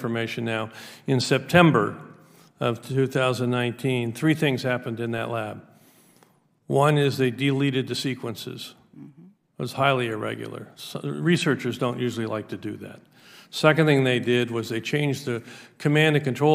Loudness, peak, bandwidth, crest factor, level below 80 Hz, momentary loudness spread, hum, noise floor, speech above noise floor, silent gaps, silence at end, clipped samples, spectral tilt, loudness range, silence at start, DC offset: -24 LUFS; 0 dBFS; 16 kHz; 24 dB; -66 dBFS; 16 LU; none; -61 dBFS; 37 dB; none; 0 s; under 0.1%; -6 dB/octave; 5 LU; 0 s; under 0.1%